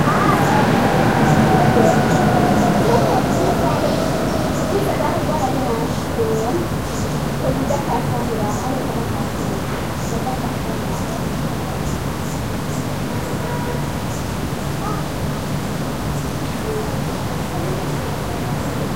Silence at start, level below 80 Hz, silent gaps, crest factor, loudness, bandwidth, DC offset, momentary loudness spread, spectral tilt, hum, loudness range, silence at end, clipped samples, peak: 0 s; -34 dBFS; none; 16 dB; -19 LUFS; 16 kHz; 2%; 9 LU; -6 dB/octave; none; 8 LU; 0 s; under 0.1%; -2 dBFS